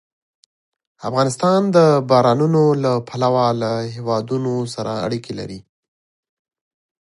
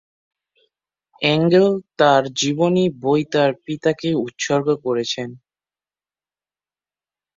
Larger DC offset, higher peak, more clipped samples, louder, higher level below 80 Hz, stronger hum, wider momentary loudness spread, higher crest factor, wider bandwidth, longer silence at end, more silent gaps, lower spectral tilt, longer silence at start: neither; about the same, 0 dBFS vs -2 dBFS; neither; about the same, -18 LUFS vs -19 LUFS; about the same, -60 dBFS vs -62 dBFS; second, none vs 50 Hz at -50 dBFS; first, 13 LU vs 7 LU; about the same, 18 dB vs 20 dB; first, 11.5 kHz vs 7.8 kHz; second, 1.5 s vs 2 s; neither; first, -6.5 dB/octave vs -5 dB/octave; second, 1 s vs 1.2 s